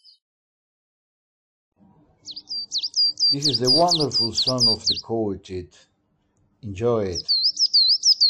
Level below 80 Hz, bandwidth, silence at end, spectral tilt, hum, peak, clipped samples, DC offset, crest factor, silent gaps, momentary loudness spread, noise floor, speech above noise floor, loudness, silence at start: -60 dBFS; 15.5 kHz; 0 s; -3 dB/octave; none; -8 dBFS; under 0.1%; under 0.1%; 14 dB; none; 18 LU; -68 dBFS; 46 dB; -19 LUFS; 2.25 s